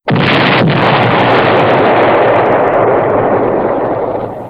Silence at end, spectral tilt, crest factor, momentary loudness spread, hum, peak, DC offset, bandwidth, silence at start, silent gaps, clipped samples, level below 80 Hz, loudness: 0 s; -8 dB/octave; 10 dB; 5 LU; none; 0 dBFS; under 0.1%; 8 kHz; 0.05 s; none; 0.2%; -40 dBFS; -10 LUFS